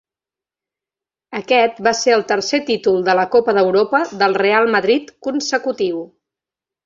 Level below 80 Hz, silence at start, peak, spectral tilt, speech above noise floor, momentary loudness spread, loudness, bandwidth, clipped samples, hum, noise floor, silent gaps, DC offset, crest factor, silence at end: -62 dBFS; 1.3 s; -2 dBFS; -3.5 dB/octave; 73 dB; 8 LU; -16 LUFS; 7.6 kHz; under 0.1%; none; -89 dBFS; none; under 0.1%; 16 dB; 0.8 s